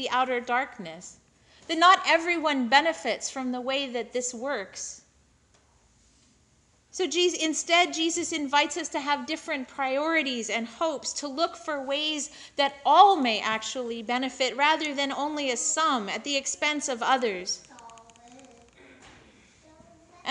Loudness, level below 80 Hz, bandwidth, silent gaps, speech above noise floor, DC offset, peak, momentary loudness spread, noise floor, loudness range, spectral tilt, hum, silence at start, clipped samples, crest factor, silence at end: -26 LUFS; -70 dBFS; 11 kHz; none; 37 dB; under 0.1%; -4 dBFS; 12 LU; -64 dBFS; 9 LU; -1 dB/octave; none; 0 s; under 0.1%; 22 dB; 0 s